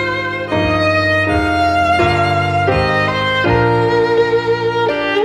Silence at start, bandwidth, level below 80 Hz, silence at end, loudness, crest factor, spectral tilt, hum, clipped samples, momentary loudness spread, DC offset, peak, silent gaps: 0 s; 12 kHz; -34 dBFS; 0 s; -14 LUFS; 12 dB; -6.5 dB/octave; none; under 0.1%; 3 LU; under 0.1%; -2 dBFS; none